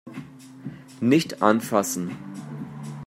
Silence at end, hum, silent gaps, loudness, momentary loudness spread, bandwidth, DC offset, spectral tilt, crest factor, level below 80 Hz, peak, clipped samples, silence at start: 0 s; none; none; -23 LUFS; 20 LU; 16 kHz; under 0.1%; -5 dB/octave; 24 dB; -68 dBFS; -2 dBFS; under 0.1%; 0.05 s